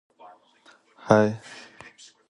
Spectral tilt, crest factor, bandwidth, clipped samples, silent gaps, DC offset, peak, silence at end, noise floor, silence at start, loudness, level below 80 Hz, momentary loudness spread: -6.5 dB/octave; 26 dB; 10.5 kHz; under 0.1%; none; under 0.1%; -2 dBFS; 0.75 s; -58 dBFS; 1.05 s; -22 LUFS; -62 dBFS; 26 LU